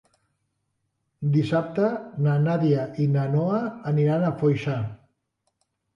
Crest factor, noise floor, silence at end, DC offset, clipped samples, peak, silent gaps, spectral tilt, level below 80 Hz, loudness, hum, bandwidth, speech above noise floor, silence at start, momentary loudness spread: 16 dB; -76 dBFS; 1 s; under 0.1%; under 0.1%; -10 dBFS; none; -9.5 dB/octave; -62 dBFS; -24 LUFS; none; 6.8 kHz; 53 dB; 1.2 s; 6 LU